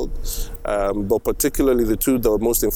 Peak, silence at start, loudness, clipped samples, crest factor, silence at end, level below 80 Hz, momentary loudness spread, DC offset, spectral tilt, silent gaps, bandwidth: -6 dBFS; 0 s; -20 LUFS; under 0.1%; 12 dB; 0 s; -28 dBFS; 10 LU; under 0.1%; -4.5 dB/octave; none; over 20 kHz